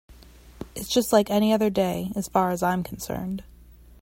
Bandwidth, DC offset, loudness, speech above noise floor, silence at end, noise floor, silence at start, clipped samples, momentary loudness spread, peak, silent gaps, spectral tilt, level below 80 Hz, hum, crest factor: 16.5 kHz; under 0.1%; -24 LUFS; 26 dB; 0.4 s; -49 dBFS; 0.1 s; under 0.1%; 15 LU; -6 dBFS; none; -5 dB/octave; -50 dBFS; none; 20 dB